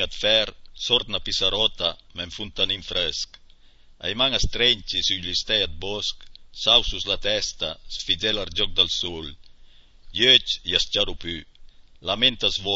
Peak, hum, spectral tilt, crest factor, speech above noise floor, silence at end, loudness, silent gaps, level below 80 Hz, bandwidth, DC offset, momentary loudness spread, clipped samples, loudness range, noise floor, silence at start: -2 dBFS; none; -2 dB/octave; 22 dB; 26 dB; 0 s; -22 LUFS; none; -40 dBFS; 8 kHz; under 0.1%; 14 LU; under 0.1%; 3 LU; -50 dBFS; 0 s